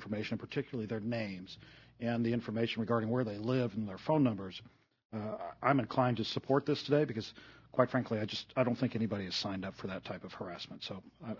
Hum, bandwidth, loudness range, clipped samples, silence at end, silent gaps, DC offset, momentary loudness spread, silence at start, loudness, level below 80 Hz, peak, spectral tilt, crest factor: none; 6 kHz; 3 LU; under 0.1%; 0 s; 5.05-5.10 s; under 0.1%; 13 LU; 0 s; -35 LUFS; -70 dBFS; -12 dBFS; -7 dB/octave; 24 dB